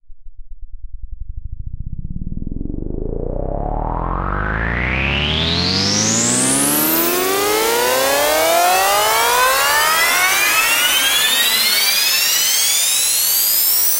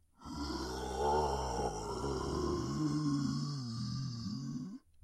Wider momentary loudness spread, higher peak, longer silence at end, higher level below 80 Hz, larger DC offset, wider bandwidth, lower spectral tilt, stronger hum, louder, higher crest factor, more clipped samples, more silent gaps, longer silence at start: first, 16 LU vs 8 LU; first, -2 dBFS vs -22 dBFS; second, 0 s vs 0.25 s; first, -30 dBFS vs -48 dBFS; neither; first, 16.5 kHz vs 14 kHz; second, -1.5 dB/octave vs -6 dB/octave; neither; first, -14 LUFS vs -37 LUFS; about the same, 14 dB vs 16 dB; neither; neither; second, 0.05 s vs 0.2 s